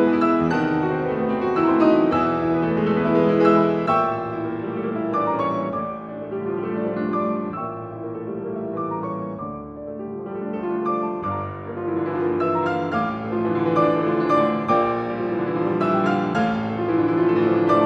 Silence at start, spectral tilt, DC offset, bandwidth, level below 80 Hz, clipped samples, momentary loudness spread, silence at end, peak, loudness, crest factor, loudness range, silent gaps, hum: 0 s; -8.5 dB/octave; under 0.1%; 6.6 kHz; -54 dBFS; under 0.1%; 12 LU; 0 s; -4 dBFS; -22 LUFS; 18 dB; 9 LU; none; none